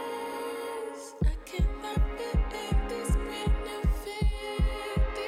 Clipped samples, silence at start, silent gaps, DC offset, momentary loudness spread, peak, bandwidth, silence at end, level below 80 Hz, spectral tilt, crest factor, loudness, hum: under 0.1%; 0 s; none; under 0.1%; 5 LU; -16 dBFS; 14.5 kHz; 0 s; -30 dBFS; -6 dB/octave; 14 dB; -32 LUFS; none